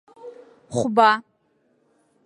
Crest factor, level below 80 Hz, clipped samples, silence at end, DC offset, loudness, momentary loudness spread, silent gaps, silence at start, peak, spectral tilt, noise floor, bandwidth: 22 dB; -64 dBFS; under 0.1%; 1.05 s; under 0.1%; -20 LUFS; 26 LU; none; 0.25 s; -2 dBFS; -4.5 dB/octave; -66 dBFS; 11.5 kHz